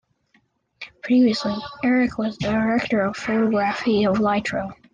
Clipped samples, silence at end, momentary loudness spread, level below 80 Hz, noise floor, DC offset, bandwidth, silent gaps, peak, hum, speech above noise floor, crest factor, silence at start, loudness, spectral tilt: under 0.1%; 0.2 s; 9 LU; -52 dBFS; -64 dBFS; under 0.1%; 9 kHz; none; -10 dBFS; none; 43 dB; 12 dB; 0.8 s; -21 LUFS; -6 dB/octave